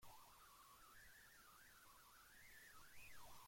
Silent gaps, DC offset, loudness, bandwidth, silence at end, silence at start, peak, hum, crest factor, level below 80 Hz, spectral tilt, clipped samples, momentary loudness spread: none; under 0.1%; -65 LUFS; 16.5 kHz; 0 s; 0 s; -50 dBFS; none; 14 dB; -78 dBFS; -1.5 dB/octave; under 0.1%; 3 LU